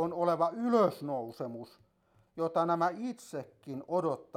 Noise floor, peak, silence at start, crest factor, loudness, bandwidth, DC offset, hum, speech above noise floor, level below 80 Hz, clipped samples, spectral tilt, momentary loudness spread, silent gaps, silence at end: -69 dBFS; -14 dBFS; 0 s; 18 dB; -32 LUFS; 15.5 kHz; under 0.1%; none; 37 dB; -78 dBFS; under 0.1%; -7 dB/octave; 16 LU; none; 0.15 s